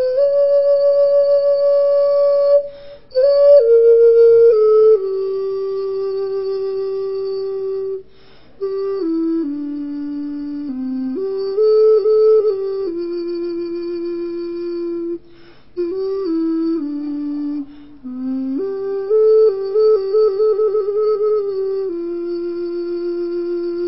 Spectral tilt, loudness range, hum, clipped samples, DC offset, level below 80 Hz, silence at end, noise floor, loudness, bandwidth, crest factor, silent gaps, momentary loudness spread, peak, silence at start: -10.5 dB/octave; 11 LU; none; under 0.1%; 0.7%; -56 dBFS; 0 s; -48 dBFS; -17 LUFS; 5.8 kHz; 14 dB; none; 14 LU; -2 dBFS; 0 s